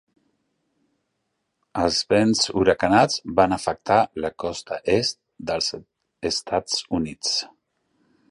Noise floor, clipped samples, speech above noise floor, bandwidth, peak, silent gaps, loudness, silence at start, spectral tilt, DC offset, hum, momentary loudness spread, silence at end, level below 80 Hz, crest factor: -76 dBFS; under 0.1%; 54 dB; 11.5 kHz; -2 dBFS; none; -22 LUFS; 1.75 s; -3.5 dB/octave; under 0.1%; none; 11 LU; 0.85 s; -50 dBFS; 22 dB